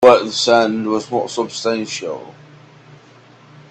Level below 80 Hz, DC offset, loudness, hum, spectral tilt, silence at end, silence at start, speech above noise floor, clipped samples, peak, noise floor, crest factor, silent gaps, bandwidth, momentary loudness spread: -60 dBFS; under 0.1%; -17 LUFS; none; -3.5 dB/octave; 1.4 s; 0 s; 28 dB; under 0.1%; 0 dBFS; -46 dBFS; 18 dB; none; 9.2 kHz; 14 LU